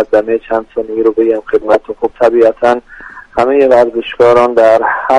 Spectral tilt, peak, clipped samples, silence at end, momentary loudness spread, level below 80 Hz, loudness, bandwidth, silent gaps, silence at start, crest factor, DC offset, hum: -6 dB/octave; 0 dBFS; 0.2%; 0 s; 10 LU; -44 dBFS; -11 LUFS; 10.5 kHz; none; 0 s; 10 dB; under 0.1%; none